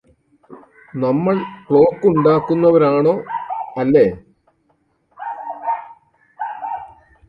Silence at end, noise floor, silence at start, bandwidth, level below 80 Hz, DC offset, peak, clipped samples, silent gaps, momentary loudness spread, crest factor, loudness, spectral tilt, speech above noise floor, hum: 0.4 s; -63 dBFS; 0.5 s; 5.2 kHz; -54 dBFS; under 0.1%; 0 dBFS; under 0.1%; none; 17 LU; 18 dB; -17 LUFS; -10 dB/octave; 48 dB; none